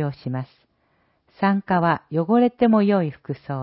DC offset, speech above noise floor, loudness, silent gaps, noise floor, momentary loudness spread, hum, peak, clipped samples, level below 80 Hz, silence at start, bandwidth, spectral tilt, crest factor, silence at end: under 0.1%; 45 dB; -21 LUFS; none; -66 dBFS; 13 LU; none; -6 dBFS; under 0.1%; -60 dBFS; 0 s; 5.6 kHz; -12.5 dB/octave; 16 dB; 0 s